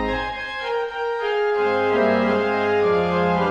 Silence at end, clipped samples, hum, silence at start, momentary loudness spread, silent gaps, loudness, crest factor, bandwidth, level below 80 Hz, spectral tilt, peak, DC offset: 0 s; under 0.1%; none; 0 s; 7 LU; none; -21 LUFS; 14 dB; 8 kHz; -44 dBFS; -6.5 dB/octave; -8 dBFS; under 0.1%